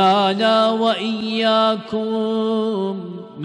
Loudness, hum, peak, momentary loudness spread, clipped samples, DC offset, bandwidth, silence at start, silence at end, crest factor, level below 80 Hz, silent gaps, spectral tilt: -18 LUFS; none; -6 dBFS; 8 LU; under 0.1%; under 0.1%; 10.5 kHz; 0 s; 0 s; 12 dB; -66 dBFS; none; -5.5 dB/octave